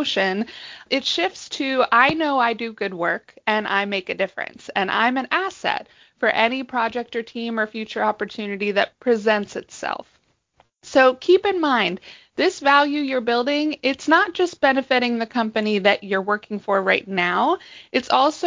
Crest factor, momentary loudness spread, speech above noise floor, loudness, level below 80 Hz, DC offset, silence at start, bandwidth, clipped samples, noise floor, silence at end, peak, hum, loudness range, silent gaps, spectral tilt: 20 dB; 11 LU; 41 dB; -21 LUFS; -64 dBFS; under 0.1%; 0 s; 7.6 kHz; under 0.1%; -62 dBFS; 0 s; -2 dBFS; none; 4 LU; none; -4 dB/octave